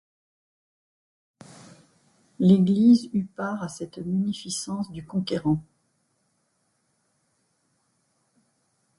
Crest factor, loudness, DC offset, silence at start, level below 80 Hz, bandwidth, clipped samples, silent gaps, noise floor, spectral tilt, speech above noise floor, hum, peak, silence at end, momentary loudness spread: 20 dB; -24 LUFS; under 0.1%; 2.4 s; -62 dBFS; 11.5 kHz; under 0.1%; none; -72 dBFS; -6.5 dB/octave; 49 dB; none; -6 dBFS; 3.35 s; 14 LU